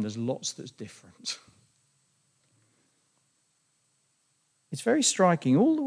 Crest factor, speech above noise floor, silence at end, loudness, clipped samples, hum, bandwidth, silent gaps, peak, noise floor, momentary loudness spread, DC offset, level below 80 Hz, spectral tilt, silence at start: 22 dB; 45 dB; 0 s; -27 LUFS; under 0.1%; none; 10.5 kHz; none; -10 dBFS; -72 dBFS; 20 LU; under 0.1%; -82 dBFS; -4.5 dB/octave; 0 s